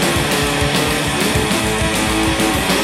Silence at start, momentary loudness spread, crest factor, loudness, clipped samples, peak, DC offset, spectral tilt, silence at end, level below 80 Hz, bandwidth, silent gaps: 0 s; 1 LU; 14 dB; -16 LUFS; under 0.1%; -2 dBFS; under 0.1%; -3.5 dB/octave; 0 s; -30 dBFS; 16.5 kHz; none